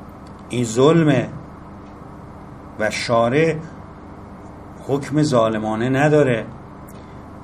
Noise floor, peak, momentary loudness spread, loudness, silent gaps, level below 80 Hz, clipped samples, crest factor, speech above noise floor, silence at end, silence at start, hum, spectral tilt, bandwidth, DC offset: -37 dBFS; -2 dBFS; 23 LU; -18 LUFS; none; -46 dBFS; under 0.1%; 18 dB; 20 dB; 0 s; 0 s; none; -6 dB/octave; 13.5 kHz; under 0.1%